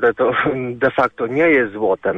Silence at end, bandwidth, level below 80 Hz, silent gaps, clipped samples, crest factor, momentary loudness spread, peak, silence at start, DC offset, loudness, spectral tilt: 0 s; 6 kHz; -52 dBFS; none; under 0.1%; 12 dB; 5 LU; -4 dBFS; 0 s; under 0.1%; -17 LUFS; -8 dB/octave